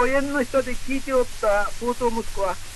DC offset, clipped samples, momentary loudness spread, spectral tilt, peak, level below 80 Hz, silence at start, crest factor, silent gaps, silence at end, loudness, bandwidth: under 0.1%; under 0.1%; 5 LU; -4 dB/octave; -8 dBFS; -34 dBFS; 0 s; 14 dB; none; 0 s; -24 LUFS; 12 kHz